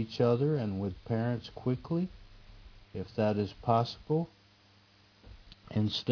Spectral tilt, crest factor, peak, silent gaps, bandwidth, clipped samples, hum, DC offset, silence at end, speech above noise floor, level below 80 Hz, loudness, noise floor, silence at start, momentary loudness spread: -8 dB/octave; 22 dB; -12 dBFS; none; 5.4 kHz; under 0.1%; none; under 0.1%; 0 s; 31 dB; -58 dBFS; -32 LUFS; -62 dBFS; 0 s; 10 LU